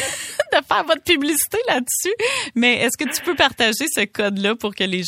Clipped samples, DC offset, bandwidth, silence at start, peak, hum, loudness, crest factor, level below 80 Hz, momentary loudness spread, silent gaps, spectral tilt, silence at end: under 0.1%; under 0.1%; 16.5 kHz; 0 s; 0 dBFS; none; -19 LUFS; 20 dB; -56 dBFS; 6 LU; none; -2 dB/octave; 0 s